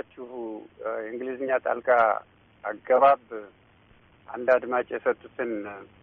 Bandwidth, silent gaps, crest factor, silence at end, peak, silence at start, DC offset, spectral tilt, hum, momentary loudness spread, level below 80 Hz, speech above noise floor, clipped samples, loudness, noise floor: 4.3 kHz; none; 18 dB; 0.2 s; -10 dBFS; 0.15 s; under 0.1%; -3 dB/octave; none; 18 LU; -68 dBFS; 32 dB; under 0.1%; -26 LUFS; -58 dBFS